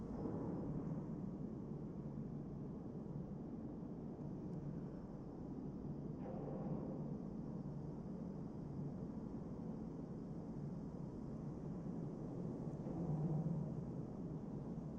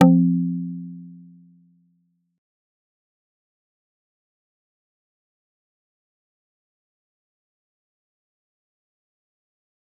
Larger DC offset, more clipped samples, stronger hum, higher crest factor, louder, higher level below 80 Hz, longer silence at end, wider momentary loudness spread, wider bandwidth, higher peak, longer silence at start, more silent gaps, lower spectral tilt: neither; neither; neither; second, 14 dB vs 26 dB; second, -47 LUFS vs -20 LUFS; first, -62 dBFS vs -78 dBFS; second, 0 s vs 8.85 s; second, 5 LU vs 24 LU; first, 7.4 kHz vs 3.6 kHz; second, -32 dBFS vs -2 dBFS; about the same, 0 s vs 0 s; neither; first, -10.5 dB/octave vs -9 dB/octave